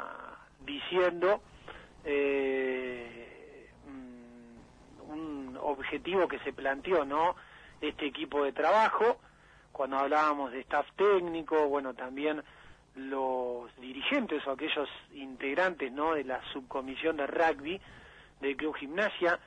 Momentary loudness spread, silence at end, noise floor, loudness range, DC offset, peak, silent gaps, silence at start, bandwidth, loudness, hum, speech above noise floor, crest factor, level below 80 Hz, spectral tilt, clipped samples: 19 LU; 0.1 s; -59 dBFS; 6 LU; under 0.1%; -16 dBFS; none; 0 s; 10 kHz; -32 LUFS; none; 28 dB; 16 dB; -64 dBFS; -5 dB/octave; under 0.1%